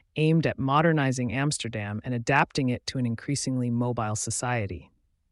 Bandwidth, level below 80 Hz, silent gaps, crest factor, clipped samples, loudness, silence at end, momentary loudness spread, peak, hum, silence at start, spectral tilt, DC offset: 11.5 kHz; -56 dBFS; none; 18 dB; under 0.1%; -26 LUFS; 0.5 s; 8 LU; -8 dBFS; none; 0.15 s; -5 dB/octave; under 0.1%